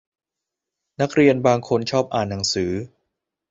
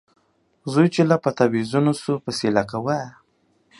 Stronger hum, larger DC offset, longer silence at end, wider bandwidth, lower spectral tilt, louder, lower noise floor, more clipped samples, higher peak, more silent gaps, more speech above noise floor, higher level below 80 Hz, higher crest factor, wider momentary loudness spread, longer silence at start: neither; neither; about the same, 0.65 s vs 0.7 s; second, 8 kHz vs 11.5 kHz; second, -5 dB/octave vs -6.5 dB/octave; about the same, -20 LUFS vs -21 LUFS; first, -85 dBFS vs -64 dBFS; neither; about the same, -2 dBFS vs -2 dBFS; neither; first, 65 dB vs 44 dB; first, -50 dBFS vs -60 dBFS; about the same, 20 dB vs 20 dB; about the same, 10 LU vs 8 LU; first, 1 s vs 0.65 s